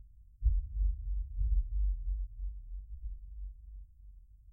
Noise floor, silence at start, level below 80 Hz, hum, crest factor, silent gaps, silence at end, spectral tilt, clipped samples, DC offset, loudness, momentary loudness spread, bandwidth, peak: -54 dBFS; 0 s; -36 dBFS; none; 18 dB; none; 0 s; -11 dB/octave; under 0.1%; under 0.1%; -39 LUFS; 19 LU; 0.2 kHz; -18 dBFS